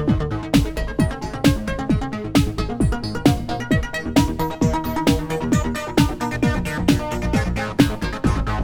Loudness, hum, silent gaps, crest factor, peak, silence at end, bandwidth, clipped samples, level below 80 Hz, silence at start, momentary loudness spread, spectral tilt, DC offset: -21 LUFS; none; none; 18 dB; -2 dBFS; 0 s; 19 kHz; under 0.1%; -28 dBFS; 0 s; 3 LU; -6 dB/octave; under 0.1%